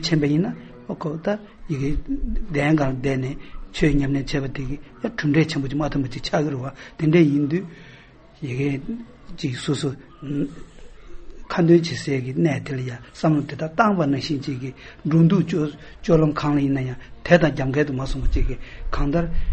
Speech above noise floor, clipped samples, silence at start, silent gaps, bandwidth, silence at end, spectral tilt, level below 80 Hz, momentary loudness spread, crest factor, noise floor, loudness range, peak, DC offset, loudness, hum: 26 dB; under 0.1%; 0 s; none; 8.4 kHz; 0 s; -7 dB/octave; -32 dBFS; 14 LU; 22 dB; -47 dBFS; 5 LU; 0 dBFS; under 0.1%; -22 LUFS; none